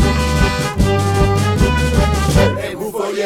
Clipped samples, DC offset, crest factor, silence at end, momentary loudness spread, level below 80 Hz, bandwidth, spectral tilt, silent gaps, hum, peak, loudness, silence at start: under 0.1%; under 0.1%; 14 dB; 0 s; 7 LU; -20 dBFS; 16.5 kHz; -5.5 dB/octave; none; none; 0 dBFS; -16 LUFS; 0 s